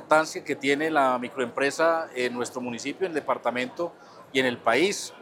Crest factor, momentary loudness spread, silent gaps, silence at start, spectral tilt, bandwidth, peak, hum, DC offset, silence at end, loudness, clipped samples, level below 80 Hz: 20 dB; 9 LU; none; 0 s; -3.5 dB/octave; 17.5 kHz; -6 dBFS; none; under 0.1%; 0 s; -26 LUFS; under 0.1%; -80 dBFS